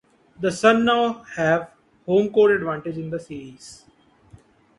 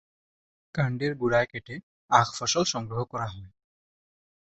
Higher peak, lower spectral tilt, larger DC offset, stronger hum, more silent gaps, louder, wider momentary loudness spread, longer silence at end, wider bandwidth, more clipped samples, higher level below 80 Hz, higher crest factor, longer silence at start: about the same, -2 dBFS vs -4 dBFS; first, -5.5 dB/octave vs -4 dB/octave; neither; neither; second, none vs 1.83-2.08 s; first, -21 LUFS vs -27 LUFS; first, 21 LU vs 16 LU; about the same, 1.05 s vs 1.1 s; first, 11.5 kHz vs 8.2 kHz; neither; about the same, -58 dBFS vs -58 dBFS; about the same, 20 dB vs 24 dB; second, 0.4 s vs 0.75 s